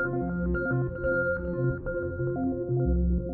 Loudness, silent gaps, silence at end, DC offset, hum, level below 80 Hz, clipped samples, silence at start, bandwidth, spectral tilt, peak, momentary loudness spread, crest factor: -29 LUFS; none; 0 s; under 0.1%; none; -34 dBFS; under 0.1%; 0 s; 2.2 kHz; -13.5 dB/octave; -16 dBFS; 4 LU; 12 dB